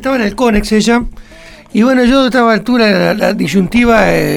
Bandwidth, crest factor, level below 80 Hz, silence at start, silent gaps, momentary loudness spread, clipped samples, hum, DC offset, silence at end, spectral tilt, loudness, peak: 16 kHz; 10 dB; -28 dBFS; 0 s; none; 5 LU; under 0.1%; none; under 0.1%; 0 s; -5.5 dB/octave; -11 LUFS; 0 dBFS